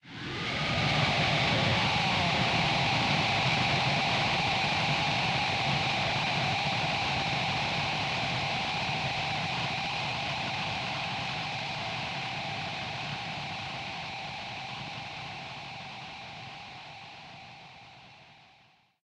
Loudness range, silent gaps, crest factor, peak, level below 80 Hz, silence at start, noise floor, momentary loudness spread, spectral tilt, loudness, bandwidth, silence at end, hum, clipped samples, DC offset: 14 LU; none; 16 dB; -14 dBFS; -54 dBFS; 0.05 s; -63 dBFS; 16 LU; -4 dB/octave; -29 LUFS; 12 kHz; 0.7 s; none; under 0.1%; under 0.1%